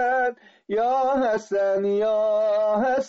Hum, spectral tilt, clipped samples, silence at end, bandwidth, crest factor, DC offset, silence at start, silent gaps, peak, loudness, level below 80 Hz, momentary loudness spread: none; -3.5 dB/octave; under 0.1%; 0 s; 7.8 kHz; 10 dB; under 0.1%; 0 s; none; -12 dBFS; -23 LUFS; -62 dBFS; 3 LU